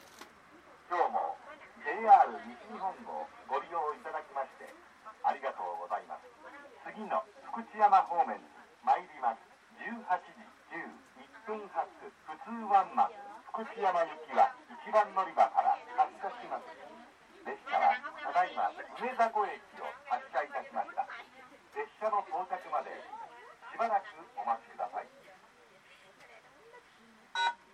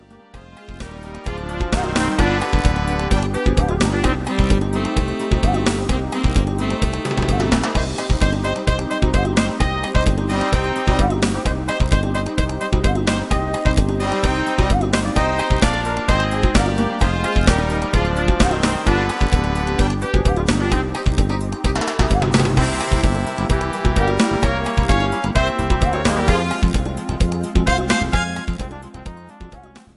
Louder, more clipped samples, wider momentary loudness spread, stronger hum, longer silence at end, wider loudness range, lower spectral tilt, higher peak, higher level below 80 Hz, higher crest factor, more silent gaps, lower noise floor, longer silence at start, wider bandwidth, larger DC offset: second, -33 LUFS vs -19 LUFS; neither; first, 19 LU vs 5 LU; neither; about the same, 0.2 s vs 0.2 s; first, 8 LU vs 2 LU; second, -3.5 dB/octave vs -5.5 dB/octave; second, -10 dBFS vs 0 dBFS; second, -82 dBFS vs -22 dBFS; first, 24 dB vs 18 dB; neither; first, -60 dBFS vs -42 dBFS; second, 0.05 s vs 0.35 s; second, 10 kHz vs 11.5 kHz; neither